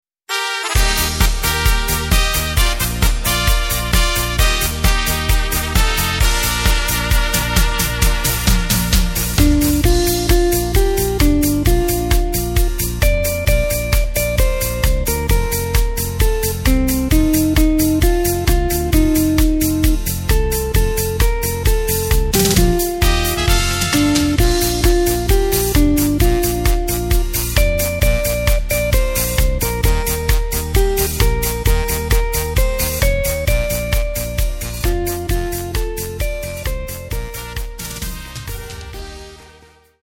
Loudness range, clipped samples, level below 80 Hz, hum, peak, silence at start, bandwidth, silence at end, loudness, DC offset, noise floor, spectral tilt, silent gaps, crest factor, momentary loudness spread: 5 LU; under 0.1%; -18 dBFS; none; 0 dBFS; 0.3 s; 17 kHz; 0.6 s; -17 LUFS; under 0.1%; -47 dBFS; -4 dB/octave; none; 16 dB; 7 LU